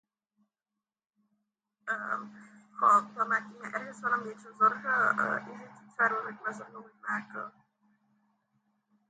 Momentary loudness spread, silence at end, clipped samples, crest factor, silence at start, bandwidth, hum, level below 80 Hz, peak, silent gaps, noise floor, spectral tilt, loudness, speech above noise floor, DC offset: 20 LU; 1.6 s; under 0.1%; 22 dB; 1.85 s; 9 kHz; none; -86 dBFS; -12 dBFS; none; under -90 dBFS; -5 dB/octave; -30 LUFS; over 59 dB; under 0.1%